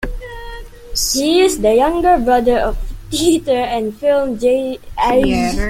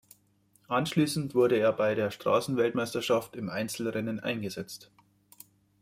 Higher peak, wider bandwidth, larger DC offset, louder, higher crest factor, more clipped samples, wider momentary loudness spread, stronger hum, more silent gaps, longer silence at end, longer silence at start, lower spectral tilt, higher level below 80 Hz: first, -2 dBFS vs -12 dBFS; about the same, 16.5 kHz vs 16 kHz; neither; first, -15 LUFS vs -29 LUFS; about the same, 14 dB vs 18 dB; neither; first, 17 LU vs 10 LU; neither; neither; second, 0 s vs 1 s; second, 0 s vs 0.7 s; second, -4 dB/octave vs -5.5 dB/octave; first, -28 dBFS vs -68 dBFS